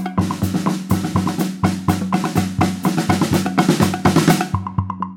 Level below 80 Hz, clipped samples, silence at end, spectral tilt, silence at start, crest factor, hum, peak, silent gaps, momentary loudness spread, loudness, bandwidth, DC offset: -42 dBFS; under 0.1%; 0 s; -6 dB/octave; 0 s; 18 dB; none; 0 dBFS; none; 6 LU; -18 LUFS; 17 kHz; under 0.1%